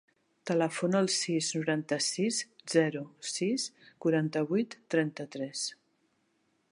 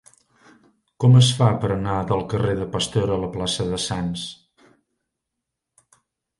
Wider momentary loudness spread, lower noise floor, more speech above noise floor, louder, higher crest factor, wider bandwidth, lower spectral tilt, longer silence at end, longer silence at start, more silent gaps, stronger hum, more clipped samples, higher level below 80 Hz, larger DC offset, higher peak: about the same, 9 LU vs 11 LU; second, -74 dBFS vs -82 dBFS; second, 43 dB vs 62 dB; second, -31 LUFS vs -21 LUFS; about the same, 20 dB vs 20 dB; about the same, 11.5 kHz vs 11.5 kHz; second, -4 dB/octave vs -5.5 dB/octave; second, 0.95 s vs 2.05 s; second, 0.45 s vs 1 s; neither; neither; neither; second, -84 dBFS vs -46 dBFS; neither; second, -12 dBFS vs -2 dBFS